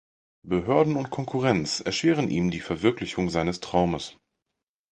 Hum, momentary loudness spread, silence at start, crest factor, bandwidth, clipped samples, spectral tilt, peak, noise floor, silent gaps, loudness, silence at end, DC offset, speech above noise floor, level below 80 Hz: none; 7 LU; 0.45 s; 20 dB; 9.8 kHz; under 0.1%; -5.5 dB/octave; -6 dBFS; -85 dBFS; none; -25 LUFS; 0.8 s; under 0.1%; 60 dB; -50 dBFS